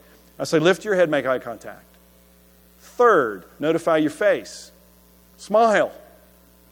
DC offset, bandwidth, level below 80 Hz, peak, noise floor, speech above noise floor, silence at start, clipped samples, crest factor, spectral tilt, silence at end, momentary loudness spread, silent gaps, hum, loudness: under 0.1%; 18.5 kHz; -60 dBFS; -4 dBFS; -53 dBFS; 33 dB; 0.4 s; under 0.1%; 18 dB; -5 dB/octave; 0.8 s; 18 LU; none; none; -20 LUFS